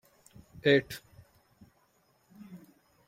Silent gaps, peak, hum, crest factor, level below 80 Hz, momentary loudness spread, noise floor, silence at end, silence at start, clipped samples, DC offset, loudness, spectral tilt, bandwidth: none; -10 dBFS; none; 26 dB; -68 dBFS; 25 LU; -69 dBFS; 0.5 s; 0.65 s; under 0.1%; under 0.1%; -27 LUFS; -5.5 dB/octave; 16.5 kHz